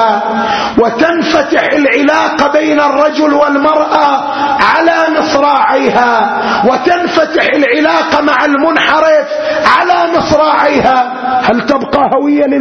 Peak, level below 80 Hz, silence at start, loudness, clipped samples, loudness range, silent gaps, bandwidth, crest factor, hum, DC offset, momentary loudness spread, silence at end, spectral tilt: 0 dBFS; -42 dBFS; 0 s; -9 LUFS; 0.2%; 1 LU; none; 7.4 kHz; 10 dB; none; under 0.1%; 3 LU; 0 s; -4.5 dB/octave